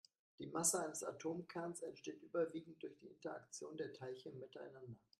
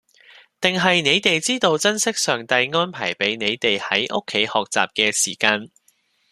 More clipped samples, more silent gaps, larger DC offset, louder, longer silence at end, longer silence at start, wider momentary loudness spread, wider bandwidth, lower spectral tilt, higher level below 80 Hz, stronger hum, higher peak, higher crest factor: neither; neither; neither; second, -46 LUFS vs -19 LUFS; second, 0.25 s vs 0.65 s; second, 0.4 s vs 0.6 s; first, 17 LU vs 5 LU; about the same, 13.5 kHz vs 14 kHz; first, -3.5 dB/octave vs -2 dB/octave; second, -86 dBFS vs -64 dBFS; neither; second, -22 dBFS vs 0 dBFS; first, 26 dB vs 20 dB